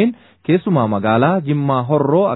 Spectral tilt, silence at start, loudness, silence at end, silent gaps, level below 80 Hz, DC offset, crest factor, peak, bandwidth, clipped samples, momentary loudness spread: -12 dB/octave; 0 s; -16 LUFS; 0 s; none; -58 dBFS; under 0.1%; 14 dB; 0 dBFS; 4.1 kHz; under 0.1%; 4 LU